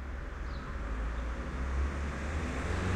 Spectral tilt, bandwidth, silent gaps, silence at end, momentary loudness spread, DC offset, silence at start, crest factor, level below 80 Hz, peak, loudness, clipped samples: -6 dB/octave; 10 kHz; none; 0 s; 6 LU; under 0.1%; 0 s; 12 dB; -36 dBFS; -22 dBFS; -37 LUFS; under 0.1%